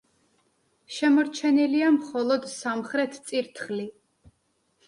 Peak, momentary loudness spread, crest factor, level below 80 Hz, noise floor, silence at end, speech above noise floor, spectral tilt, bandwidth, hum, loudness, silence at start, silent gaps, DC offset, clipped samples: -12 dBFS; 11 LU; 14 dB; -72 dBFS; -71 dBFS; 0.95 s; 47 dB; -4 dB/octave; 11.5 kHz; none; -25 LUFS; 0.9 s; none; under 0.1%; under 0.1%